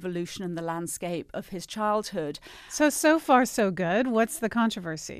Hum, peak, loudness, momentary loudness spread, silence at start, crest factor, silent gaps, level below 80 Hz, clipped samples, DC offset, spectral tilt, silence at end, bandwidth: none; -8 dBFS; -27 LUFS; 15 LU; 0 s; 18 dB; none; -60 dBFS; under 0.1%; under 0.1%; -4 dB/octave; 0 s; 15 kHz